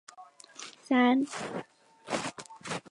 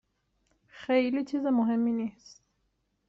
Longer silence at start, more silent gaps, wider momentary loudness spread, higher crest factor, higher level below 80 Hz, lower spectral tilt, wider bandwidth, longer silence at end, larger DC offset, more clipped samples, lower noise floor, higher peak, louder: second, 0.2 s vs 0.75 s; neither; first, 23 LU vs 10 LU; about the same, 18 dB vs 18 dB; about the same, -76 dBFS vs -72 dBFS; second, -4 dB/octave vs -6.5 dB/octave; first, 11.5 kHz vs 7.4 kHz; second, 0.1 s vs 1 s; neither; neither; second, -53 dBFS vs -76 dBFS; about the same, -14 dBFS vs -12 dBFS; about the same, -30 LUFS vs -28 LUFS